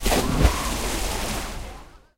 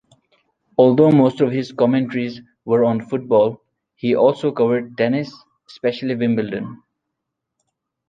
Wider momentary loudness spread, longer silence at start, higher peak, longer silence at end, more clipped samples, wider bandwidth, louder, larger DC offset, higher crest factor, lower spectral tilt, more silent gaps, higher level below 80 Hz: first, 17 LU vs 13 LU; second, 0 s vs 0.8 s; about the same, -4 dBFS vs -2 dBFS; second, 0.2 s vs 1.35 s; neither; first, 16 kHz vs 7.6 kHz; second, -25 LUFS vs -18 LUFS; neither; about the same, 20 dB vs 18 dB; second, -4 dB/octave vs -8.5 dB/octave; neither; first, -28 dBFS vs -62 dBFS